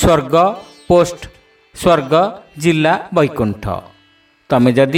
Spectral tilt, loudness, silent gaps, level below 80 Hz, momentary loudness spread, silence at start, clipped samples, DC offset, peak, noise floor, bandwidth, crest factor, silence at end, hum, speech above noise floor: -6 dB/octave; -15 LUFS; none; -36 dBFS; 12 LU; 0 s; under 0.1%; under 0.1%; 0 dBFS; -53 dBFS; 16.5 kHz; 14 dB; 0 s; none; 39 dB